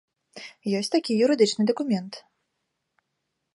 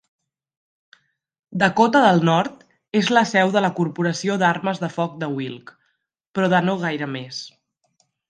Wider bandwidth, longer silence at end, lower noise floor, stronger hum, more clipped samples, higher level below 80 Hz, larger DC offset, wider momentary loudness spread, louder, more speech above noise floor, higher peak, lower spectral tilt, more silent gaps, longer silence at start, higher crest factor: first, 11.5 kHz vs 9.6 kHz; first, 1.35 s vs 0.8 s; first, -79 dBFS vs -72 dBFS; neither; neither; second, -78 dBFS vs -66 dBFS; neither; first, 22 LU vs 16 LU; second, -24 LUFS vs -20 LUFS; first, 56 dB vs 52 dB; second, -8 dBFS vs -2 dBFS; about the same, -5 dB/octave vs -5.5 dB/octave; second, none vs 6.27-6.34 s; second, 0.35 s vs 1.5 s; about the same, 20 dB vs 20 dB